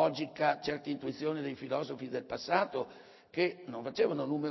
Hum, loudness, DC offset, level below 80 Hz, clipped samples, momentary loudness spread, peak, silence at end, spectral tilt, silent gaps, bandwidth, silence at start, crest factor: none; -35 LUFS; under 0.1%; -72 dBFS; under 0.1%; 8 LU; -14 dBFS; 0 s; -6 dB/octave; none; 6.2 kHz; 0 s; 20 dB